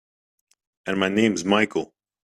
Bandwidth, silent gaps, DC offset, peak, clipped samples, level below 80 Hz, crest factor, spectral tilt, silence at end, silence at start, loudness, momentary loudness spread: 12.5 kHz; none; under 0.1%; -4 dBFS; under 0.1%; -62 dBFS; 20 dB; -4.5 dB/octave; 0.45 s; 0.85 s; -22 LUFS; 14 LU